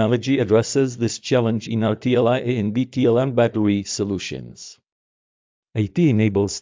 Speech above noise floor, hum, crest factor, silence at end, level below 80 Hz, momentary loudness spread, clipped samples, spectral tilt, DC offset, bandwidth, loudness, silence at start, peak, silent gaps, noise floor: over 70 dB; none; 16 dB; 0 s; -50 dBFS; 11 LU; under 0.1%; -6 dB/octave; under 0.1%; 7.6 kHz; -20 LUFS; 0 s; -6 dBFS; 4.92-5.63 s; under -90 dBFS